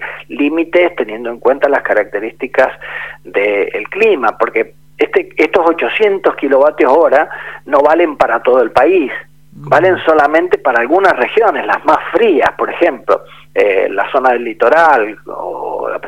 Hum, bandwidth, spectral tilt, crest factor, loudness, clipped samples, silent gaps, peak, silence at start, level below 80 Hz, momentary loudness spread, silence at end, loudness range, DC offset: none; 12.5 kHz; -5.5 dB/octave; 12 dB; -12 LUFS; 0.1%; none; 0 dBFS; 0 s; -52 dBFS; 10 LU; 0 s; 3 LU; 0.8%